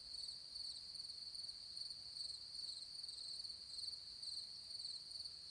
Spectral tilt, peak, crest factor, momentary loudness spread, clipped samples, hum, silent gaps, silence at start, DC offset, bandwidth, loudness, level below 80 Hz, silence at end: 0.5 dB/octave; -36 dBFS; 14 dB; 2 LU; under 0.1%; none; none; 0 s; under 0.1%; 10.5 kHz; -48 LUFS; -78 dBFS; 0 s